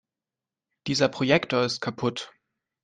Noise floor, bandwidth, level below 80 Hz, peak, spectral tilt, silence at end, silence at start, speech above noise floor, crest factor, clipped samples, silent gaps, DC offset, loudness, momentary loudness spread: -90 dBFS; 9.6 kHz; -64 dBFS; -6 dBFS; -4.5 dB/octave; 0.55 s; 0.85 s; 65 dB; 22 dB; under 0.1%; none; under 0.1%; -25 LUFS; 16 LU